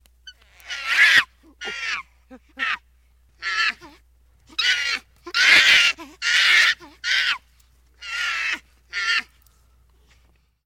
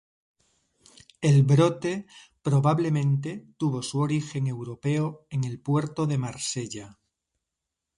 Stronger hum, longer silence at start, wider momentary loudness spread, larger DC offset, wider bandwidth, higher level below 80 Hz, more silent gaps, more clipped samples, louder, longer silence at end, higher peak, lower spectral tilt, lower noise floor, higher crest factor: neither; second, 0.25 s vs 1.2 s; first, 17 LU vs 11 LU; neither; first, 16.5 kHz vs 11 kHz; about the same, -58 dBFS vs -62 dBFS; neither; neither; first, -18 LUFS vs -26 LUFS; first, 1.4 s vs 1.05 s; first, -2 dBFS vs -8 dBFS; second, 1.5 dB/octave vs -6.5 dB/octave; second, -60 dBFS vs -85 dBFS; about the same, 20 dB vs 18 dB